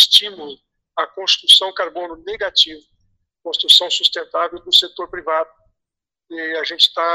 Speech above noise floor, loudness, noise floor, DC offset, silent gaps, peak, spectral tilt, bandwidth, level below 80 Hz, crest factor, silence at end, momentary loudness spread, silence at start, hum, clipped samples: 68 dB; -14 LUFS; -85 dBFS; under 0.1%; none; 0 dBFS; 1 dB/octave; 15.5 kHz; -60 dBFS; 18 dB; 0 s; 19 LU; 0 s; none; under 0.1%